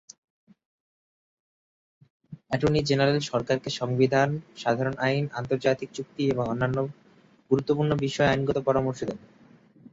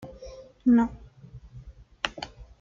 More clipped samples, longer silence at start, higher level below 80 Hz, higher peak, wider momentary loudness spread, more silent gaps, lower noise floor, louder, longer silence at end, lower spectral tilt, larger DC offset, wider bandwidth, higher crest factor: neither; first, 2.3 s vs 0 s; second, -56 dBFS vs -50 dBFS; about the same, -8 dBFS vs -6 dBFS; second, 8 LU vs 27 LU; neither; first, -57 dBFS vs -48 dBFS; about the same, -26 LUFS vs -26 LUFS; first, 0.75 s vs 0.15 s; about the same, -6 dB/octave vs -5.5 dB/octave; neither; about the same, 7.8 kHz vs 7.6 kHz; about the same, 20 dB vs 24 dB